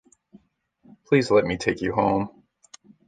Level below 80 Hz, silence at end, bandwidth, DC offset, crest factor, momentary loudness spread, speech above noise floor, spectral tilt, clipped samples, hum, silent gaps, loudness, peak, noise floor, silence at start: -52 dBFS; 0.8 s; 9.4 kHz; under 0.1%; 20 dB; 7 LU; 41 dB; -6 dB/octave; under 0.1%; none; none; -22 LUFS; -6 dBFS; -62 dBFS; 1.1 s